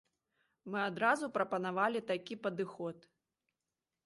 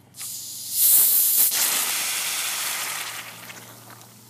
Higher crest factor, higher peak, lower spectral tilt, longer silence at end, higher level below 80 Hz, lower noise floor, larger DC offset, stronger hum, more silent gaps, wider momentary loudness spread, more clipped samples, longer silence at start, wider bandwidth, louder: about the same, 22 dB vs 20 dB; second, -18 dBFS vs -4 dBFS; first, -5.5 dB/octave vs 2 dB/octave; first, 1.05 s vs 0.2 s; about the same, -84 dBFS vs -80 dBFS; first, under -90 dBFS vs -46 dBFS; neither; neither; neither; second, 11 LU vs 20 LU; neither; first, 0.65 s vs 0.15 s; second, 11.5 kHz vs 15.5 kHz; second, -36 LUFS vs -18 LUFS